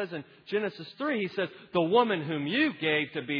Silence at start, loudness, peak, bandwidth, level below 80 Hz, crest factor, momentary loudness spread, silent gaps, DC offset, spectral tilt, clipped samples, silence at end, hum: 0 s; -29 LUFS; -10 dBFS; 5.4 kHz; -74 dBFS; 20 dB; 10 LU; none; under 0.1%; -8 dB/octave; under 0.1%; 0 s; none